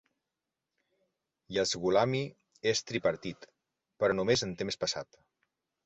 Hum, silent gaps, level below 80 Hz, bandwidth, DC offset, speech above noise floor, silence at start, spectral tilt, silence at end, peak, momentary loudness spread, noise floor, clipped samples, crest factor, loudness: none; none; -64 dBFS; 8.2 kHz; under 0.1%; 58 dB; 1.5 s; -4 dB/octave; 0.85 s; -14 dBFS; 13 LU; -88 dBFS; under 0.1%; 20 dB; -31 LUFS